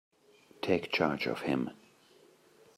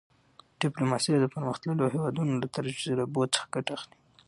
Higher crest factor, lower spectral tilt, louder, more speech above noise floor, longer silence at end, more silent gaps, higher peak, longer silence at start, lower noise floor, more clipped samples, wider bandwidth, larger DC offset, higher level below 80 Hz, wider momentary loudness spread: first, 24 dB vs 18 dB; about the same, -6 dB/octave vs -5 dB/octave; second, -33 LUFS vs -29 LUFS; about the same, 31 dB vs 31 dB; first, 1 s vs 0.4 s; neither; about the same, -12 dBFS vs -12 dBFS; about the same, 0.6 s vs 0.6 s; about the same, -62 dBFS vs -60 dBFS; neither; first, 15.5 kHz vs 11.5 kHz; neither; about the same, -70 dBFS vs -68 dBFS; about the same, 9 LU vs 7 LU